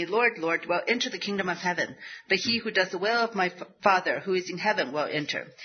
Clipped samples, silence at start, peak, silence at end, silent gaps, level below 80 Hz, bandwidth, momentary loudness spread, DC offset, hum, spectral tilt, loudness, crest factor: under 0.1%; 0 s; -6 dBFS; 0 s; none; -74 dBFS; 6.6 kHz; 6 LU; under 0.1%; none; -3.5 dB/octave; -27 LUFS; 22 dB